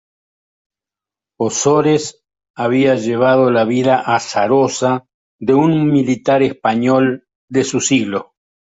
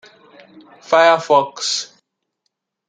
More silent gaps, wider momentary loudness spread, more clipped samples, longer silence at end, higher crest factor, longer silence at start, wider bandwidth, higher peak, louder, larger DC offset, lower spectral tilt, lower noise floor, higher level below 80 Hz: first, 2.50-2.54 s, 5.14-5.39 s, 7.35-7.48 s vs none; about the same, 9 LU vs 10 LU; neither; second, 0.45 s vs 1.05 s; about the same, 14 dB vs 18 dB; first, 1.4 s vs 0.9 s; second, 8 kHz vs 9.4 kHz; about the same, -2 dBFS vs -2 dBFS; about the same, -15 LUFS vs -15 LUFS; neither; first, -5 dB/octave vs -2 dB/octave; first, -88 dBFS vs -74 dBFS; first, -56 dBFS vs -74 dBFS